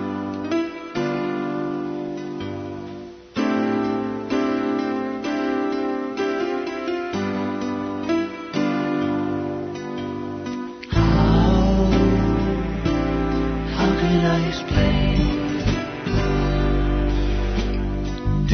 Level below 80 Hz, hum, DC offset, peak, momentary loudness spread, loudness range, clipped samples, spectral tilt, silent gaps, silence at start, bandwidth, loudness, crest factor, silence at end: -28 dBFS; none; under 0.1%; -6 dBFS; 11 LU; 6 LU; under 0.1%; -7 dB/octave; none; 0 s; 6.6 kHz; -23 LUFS; 16 dB; 0 s